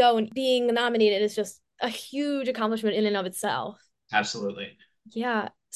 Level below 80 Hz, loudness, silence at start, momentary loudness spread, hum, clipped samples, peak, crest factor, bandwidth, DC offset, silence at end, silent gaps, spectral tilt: -74 dBFS; -27 LUFS; 0 s; 11 LU; none; under 0.1%; -8 dBFS; 18 dB; 12.5 kHz; under 0.1%; 0.25 s; none; -4 dB/octave